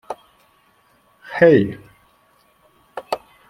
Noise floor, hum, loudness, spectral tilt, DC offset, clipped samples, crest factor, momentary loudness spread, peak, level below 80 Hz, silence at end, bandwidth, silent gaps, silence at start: -58 dBFS; none; -17 LUFS; -7.5 dB/octave; under 0.1%; under 0.1%; 22 dB; 24 LU; -2 dBFS; -60 dBFS; 0.3 s; 13.5 kHz; none; 0.1 s